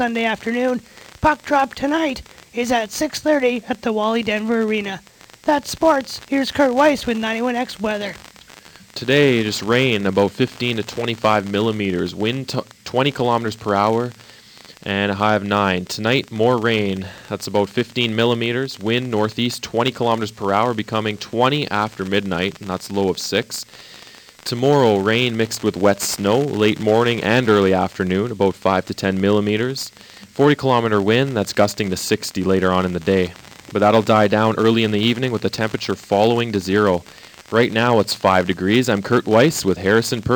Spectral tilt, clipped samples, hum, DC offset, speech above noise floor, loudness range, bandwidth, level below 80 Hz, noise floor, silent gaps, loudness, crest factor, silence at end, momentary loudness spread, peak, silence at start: -5 dB/octave; under 0.1%; none; under 0.1%; 26 dB; 3 LU; 19 kHz; -52 dBFS; -44 dBFS; none; -19 LUFS; 18 dB; 0 s; 9 LU; 0 dBFS; 0 s